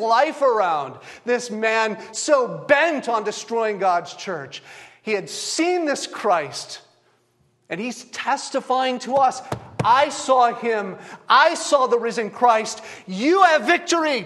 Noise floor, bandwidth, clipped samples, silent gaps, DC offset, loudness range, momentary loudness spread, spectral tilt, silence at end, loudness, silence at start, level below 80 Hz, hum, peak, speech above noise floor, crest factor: -63 dBFS; 12.5 kHz; under 0.1%; none; under 0.1%; 6 LU; 15 LU; -3 dB/octave; 0 s; -20 LUFS; 0 s; -68 dBFS; none; -2 dBFS; 43 dB; 20 dB